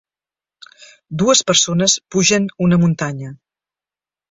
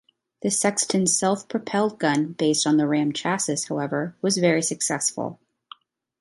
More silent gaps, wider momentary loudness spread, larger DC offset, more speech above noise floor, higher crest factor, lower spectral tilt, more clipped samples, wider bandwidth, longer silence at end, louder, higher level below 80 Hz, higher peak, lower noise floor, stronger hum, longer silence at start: neither; first, 15 LU vs 6 LU; neither; first, over 74 dB vs 26 dB; about the same, 18 dB vs 18 dB; about the same, -3.5 dB/octave vs -3.5 dB/octave; neither; second, 8 kHz vs 12 kHz; about the same, 0.95 s vs 0.85 s; first, -15 LUFS vs -23 LUFS; first, -52 dBFS vs -70 dBFS; first, 0 dBFS vs -6 dBFS; first, under -90 dBFS vs -49 dBFS; neither; first, 1.1 s vs 0.45 s